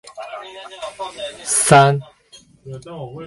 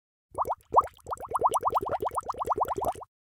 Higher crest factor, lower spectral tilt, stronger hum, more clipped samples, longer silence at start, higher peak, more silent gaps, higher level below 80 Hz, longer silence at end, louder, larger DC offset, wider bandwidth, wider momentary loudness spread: about the same, 20 dB vs 20 dB; about the same, -4 dB/octave vs -5 dB/octave; neither; neither; second, 0.05 s vs 0.35 s; first, 0 dBFS vs -10 dBFS; neither; about the same, -58 dBFS vs -56 dBFS; second, 0 s vs 0.3 s; first, -15 LUFS vs -29 LUFS; neither; second, 12 kHz vs 18 kHz; first, 23 LU vs 12 LU